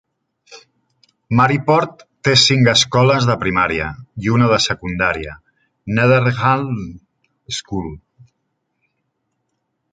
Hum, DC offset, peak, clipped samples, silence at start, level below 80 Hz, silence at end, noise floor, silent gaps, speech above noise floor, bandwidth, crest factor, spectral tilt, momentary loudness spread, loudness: none; under 0.1%; 0 dBFS; under 0.1%; 0.5 s; -44 dBFS; 1.95 s; -72 dBFS; none; 56 dB; 9.4 kHz; 18 dB; -4.5 dB/octave; 15 LU; -16 LUFS